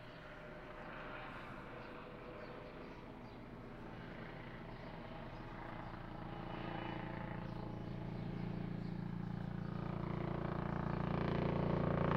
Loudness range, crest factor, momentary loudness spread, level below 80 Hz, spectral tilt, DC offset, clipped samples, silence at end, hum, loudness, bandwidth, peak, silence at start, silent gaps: 10 LU; 22 dB; 14 LU; -56 dBFS; -9 dB/octave; under 0.1%; under 0.1%; 0 s; none; -45 LUFS; 6.4 kHz; -20 dBFS; 0 s; none